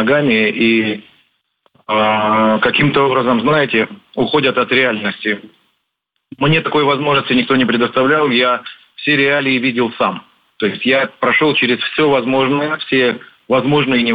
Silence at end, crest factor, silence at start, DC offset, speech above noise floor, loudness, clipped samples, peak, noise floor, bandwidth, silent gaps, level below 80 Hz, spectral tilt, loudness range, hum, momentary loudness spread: 0 s; 14 dB; 0 s; under 0.1%; 58 dB; -14 LUFS; under 0.1%; -2 dBFS; -72 dBFS; 5 kHz; none; -52 dBFS; -8 dB/octave; 2 LU; none; 8 LU